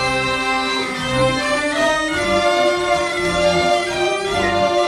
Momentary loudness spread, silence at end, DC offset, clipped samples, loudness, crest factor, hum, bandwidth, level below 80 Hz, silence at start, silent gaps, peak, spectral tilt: 3 LU; 0 s; under 0.1%; under 0.1%; -17 LUFS; 14 dB; none; 15 kHz; -40 dBFS; 0 s; none; -4 dBFS; -3.5 dB/octave